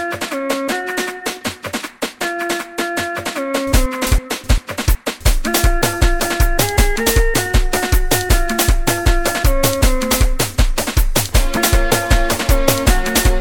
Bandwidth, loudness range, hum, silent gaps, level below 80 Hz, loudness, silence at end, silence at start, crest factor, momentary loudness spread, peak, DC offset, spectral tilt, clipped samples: 19 kHz; 5 LU; none; none; -18 dBFS; -17 LUFS; 0 s; 0 s; 16 dB; 7 LU; 0 dBFS; under 0.1%; -4 dB/octave; under 0.1%